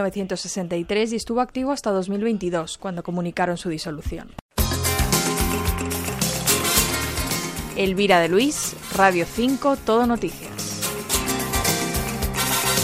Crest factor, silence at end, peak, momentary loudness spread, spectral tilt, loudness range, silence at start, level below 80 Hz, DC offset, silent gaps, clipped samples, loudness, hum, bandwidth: 20 dB; 0 s; -4 dBFS; 10 LU; -3.5 dB/octave; 5 LU; 0 s; -36 dBFS; under 0.1%; 4.41-4.49 s; under 0.1%; -22 LUFS; none; 16 kHz